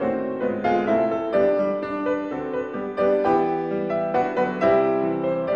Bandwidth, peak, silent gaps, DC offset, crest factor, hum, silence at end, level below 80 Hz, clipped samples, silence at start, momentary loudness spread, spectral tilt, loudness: 7 kHz; -8 dBFS; none; under 0.1%; 14 dB; none; 0 s; -56 dBFS; under 0.1%; 0 s; 7 LU; -8 dB/octave; -23 LUFS